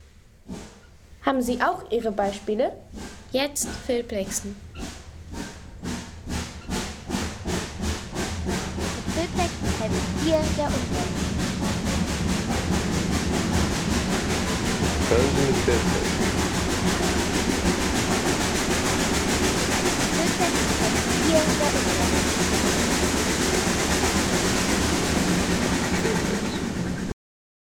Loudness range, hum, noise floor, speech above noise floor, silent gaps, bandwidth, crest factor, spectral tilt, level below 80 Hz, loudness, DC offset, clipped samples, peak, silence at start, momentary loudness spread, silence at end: 9 LU; none; -49 dBFS; 26 dB; none; 19 kHz; 18 dB; -4 dB/octave; -36 dBFS; -24 LUFS; under 0.1%; under 0.1%; -8 dBFS; 0 s; 11 LU; 0.6 s